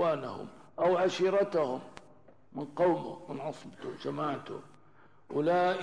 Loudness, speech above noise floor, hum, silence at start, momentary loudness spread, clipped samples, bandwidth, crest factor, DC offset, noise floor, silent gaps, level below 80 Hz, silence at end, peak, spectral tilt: -32 LUFS; 31 dB; none; 0 s; 17 LU; under 0.1%; 10.5 kHz; 14 dB; 0.1%; -62 dBFS; none; -72 dBFS; 0 s; -18 dBFS; -6 dB/octave